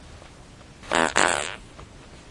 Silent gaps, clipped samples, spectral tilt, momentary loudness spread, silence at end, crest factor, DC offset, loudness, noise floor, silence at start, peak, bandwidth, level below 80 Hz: none; under 0.1%; -2 dB/octave; 25 LU; 0 s; 26 dB; under 0.1%; -23 LUFS; -46 dBFS; 0 s; -2 dBFS; 11.5 kHz; -50 dBFS